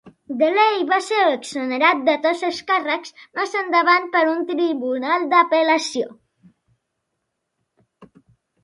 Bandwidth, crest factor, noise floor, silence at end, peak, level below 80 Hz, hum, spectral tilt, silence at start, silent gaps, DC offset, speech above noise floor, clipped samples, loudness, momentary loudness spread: 11.5 kHz; 20 dB; -77 dBFS; 0.6 s; -2 dBFS; -74 dBFS; none; -2.5 dB/octave; 0.05 s; none; under 0.1%; 58 dB; under 0.1%; -19 LUFS; 9 LU